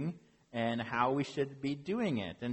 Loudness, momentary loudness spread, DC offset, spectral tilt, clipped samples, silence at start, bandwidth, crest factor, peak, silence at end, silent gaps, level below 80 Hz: -35 LUFS; 9 LU; under 0.1%; -6.5 dB/octave; under 0.1%; 0 s; 8.4 kHz; 18 dB; -16 dBFS; 0 s; none; -68 dBFS